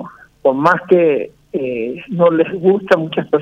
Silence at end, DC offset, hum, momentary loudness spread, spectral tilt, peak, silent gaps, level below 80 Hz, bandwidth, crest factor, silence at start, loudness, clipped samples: 0 s; under 0.1%; none; 10 LU; -8 dB/octave; 0 dBFS; none; -56 dBFS; 7.4 kHz; 14 dB; 0 s; -15 LUFS; under 0.1%